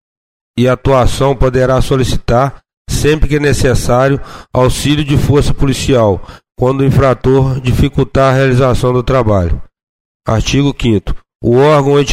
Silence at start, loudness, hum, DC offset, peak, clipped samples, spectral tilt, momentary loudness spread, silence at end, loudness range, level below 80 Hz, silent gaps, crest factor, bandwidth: 0.55 s; -12 LUFS; none; 0.4%; 0 dBFS; under 0.1%; -6 dB/octave; 7 LU; 0 s; 2 LU; -22 dBFS; 2.77-2.85 s, 9.83-10.20 s, 11.35-11.39 s; 10 dB; 15.5 kHz